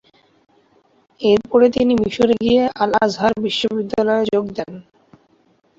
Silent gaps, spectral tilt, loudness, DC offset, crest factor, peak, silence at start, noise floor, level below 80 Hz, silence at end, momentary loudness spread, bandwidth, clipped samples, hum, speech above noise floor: none; -5.5 dB/octave; -17 LUFS; under 0.1%; 16 dB; -2 dBFS; 1.2 s; -58 dBFS; -50 dBFS; 1 s; 7 LU; 8 kHz; under 0.1%; none; 42 dB